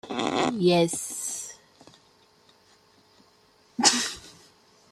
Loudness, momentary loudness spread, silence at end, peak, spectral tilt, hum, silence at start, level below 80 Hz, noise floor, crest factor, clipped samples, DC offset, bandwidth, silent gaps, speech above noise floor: -24 LUFS; 19 LU; 0.6 s; -4 dBFS; -3 dB/octave; none; 0.05 s; -66 dBFS; -60 dBFS; 26 dB; under 0.1%; under 0.1%; 15 kHz; none; 36 dB